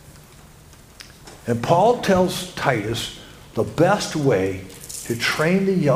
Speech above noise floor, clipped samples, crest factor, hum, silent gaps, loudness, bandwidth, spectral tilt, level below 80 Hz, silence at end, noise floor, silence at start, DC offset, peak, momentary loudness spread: 27 dB; under 0.1%; 20 dB; none; none; -20 LUFS; 16 kHz; -5 dB/octave; -48 dBFS; 0 s; -46 dBFS; 0.05 s; under 0.1%; -2 dBFS; 16 LU